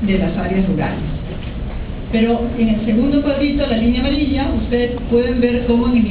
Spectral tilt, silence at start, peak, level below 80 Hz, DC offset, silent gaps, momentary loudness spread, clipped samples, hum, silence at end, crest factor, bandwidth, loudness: -11 dB/octave; 0 s; -2 dBFS; -26 dBFS; under 0.1%; none; 11 LU; under 0.1%; none; 0 s; 14 dB; 4 kHz; -17 LUFS